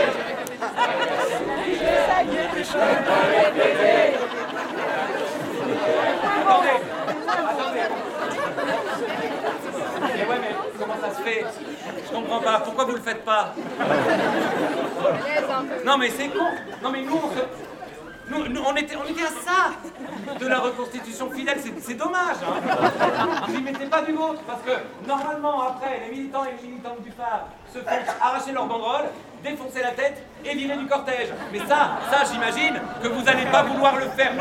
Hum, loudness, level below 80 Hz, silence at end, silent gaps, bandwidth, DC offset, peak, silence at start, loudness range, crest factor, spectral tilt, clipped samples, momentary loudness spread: none; -23 LUFS; -58 dBFS; 0 s; none; 16.5 kHz; under 0.1%; -2 dBFS; 0 s; 6 LU; 22 dB; -4 dB/octave; under 0.1%; 11 LU